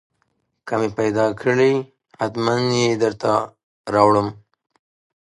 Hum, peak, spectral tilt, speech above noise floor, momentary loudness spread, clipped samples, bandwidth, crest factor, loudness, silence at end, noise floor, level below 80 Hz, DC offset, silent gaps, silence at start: none; 0 dBFS; -5.5 dB/octave; 51 dB; 13 LU; under 0.1%; 11.5 kHz; 20 dB; -20 LUFS; 0.95 s; -70 dBFS; -56 dBFS; under 0.1%; 3.63-3.84 s; 0.65 s